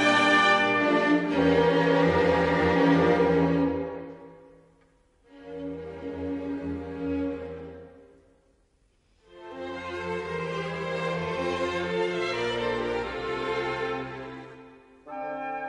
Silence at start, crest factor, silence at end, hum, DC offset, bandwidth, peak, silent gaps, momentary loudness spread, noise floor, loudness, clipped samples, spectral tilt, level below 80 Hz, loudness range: 0 s; 18 dB; 0 s; none; under 0.1%; 10.5 kHz; -10 dBFS; none; 18 LU; -66 dBFS; -26 LUFS; under 0.1%; -6 dB/octave; -52 dBFS; 15 LU